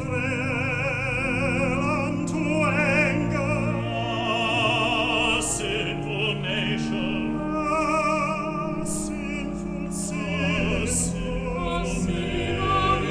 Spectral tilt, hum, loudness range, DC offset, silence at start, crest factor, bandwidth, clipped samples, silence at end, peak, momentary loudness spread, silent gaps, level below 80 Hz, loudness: -4.5 dB/octave; none; 4 LU; under 0.1%; 0 s; 16 dB; 11 kHz; under 0.1%; 0 s; -8 dBFS; 7 LU; none; -40 dBFS; -24 LUFS